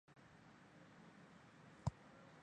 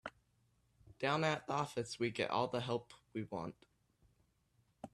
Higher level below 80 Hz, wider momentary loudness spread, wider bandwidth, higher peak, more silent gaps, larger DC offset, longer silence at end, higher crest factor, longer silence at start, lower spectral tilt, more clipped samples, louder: first, -66 dBFS vs -74 dBFS; first, 16 LU vs 13 LU; second, 9.6 kHz vs 13 kHz; second, -28 dBFS vs -22 dBFS; neither; neither; about the same, 0 s vs 0.05 s; first, 28 dB vs 20 dB; about the same, 0.1 s vs 0.05 s; first, -6.5 dB/octave vs -5 dB/octave; neither; second, -56 LUFS vs -39 LUFS